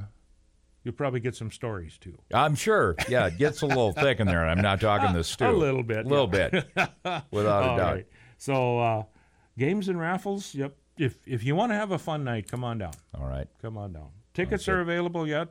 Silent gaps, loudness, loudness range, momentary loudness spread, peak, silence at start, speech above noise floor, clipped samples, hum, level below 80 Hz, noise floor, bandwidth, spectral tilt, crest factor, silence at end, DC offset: none; -27 LUFS; 7 LU; 14 LU; -10 dBFS; 0 s; 36 dB; under 0.1%; none; -46 dBFS; -62 dBFS; 16 kHz; -6 dB/octave; 18 dB; 0.05 s; under 0.1%